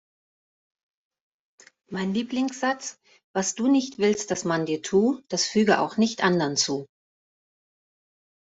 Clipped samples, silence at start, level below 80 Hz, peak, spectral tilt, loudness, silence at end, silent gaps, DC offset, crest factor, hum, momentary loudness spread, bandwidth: under 0.1%; 1.9 s; -68 dBFS; -4 dBFS; -4 dB/octave; -24 LUFS; 1.55 s; 3.24-3.34 s; under 0.1%; 22 dB; none; 9 LU; 8.2 kHz